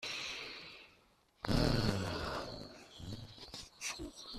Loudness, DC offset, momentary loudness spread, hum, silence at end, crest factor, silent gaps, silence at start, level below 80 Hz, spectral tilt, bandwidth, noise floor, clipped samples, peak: -39 LUFS; under 0.1%; 17 LU; none; 0 s; 22 dB; none; 0 s; -50 dBFS; -4.5 dB/octave; 14.5 kHz; -69 dBFS; under 0.1%; -18 dBFS